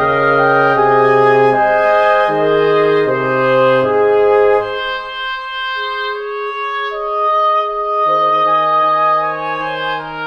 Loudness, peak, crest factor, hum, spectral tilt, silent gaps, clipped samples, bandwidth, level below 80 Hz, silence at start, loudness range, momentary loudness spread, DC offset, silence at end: -13 LUFS; 0 dBFS; 12 dB; none; -6.5 dB/octave; none; under 0.1%; 6.6 kHz; -46 dBFS; 0 s; 5 LU; 9 LU; under 0.1%; 0 s